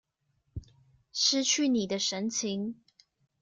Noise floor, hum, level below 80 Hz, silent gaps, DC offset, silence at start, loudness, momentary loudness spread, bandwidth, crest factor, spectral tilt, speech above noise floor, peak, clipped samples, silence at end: -76 dBFS; none; -60 dBFS; none; under 0.1%; 0.55 s; -28 LUFS; 21 LU; 10.5 kHz; 18 dB; -2.5 dB/octave; 47 dB; -14 dBFS; under 0.1%; 0.7 s